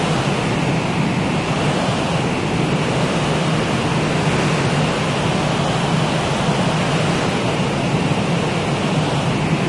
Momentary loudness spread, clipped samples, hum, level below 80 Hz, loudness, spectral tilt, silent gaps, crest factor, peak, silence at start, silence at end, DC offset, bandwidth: 1 LU; under 0.1%; none; -40 dBFS; -18 LUFS; -5.5 dB/octave; none; 14 dB; -4 dBFS; 0 s; 0 s; under 0.1%; 11.5 kHz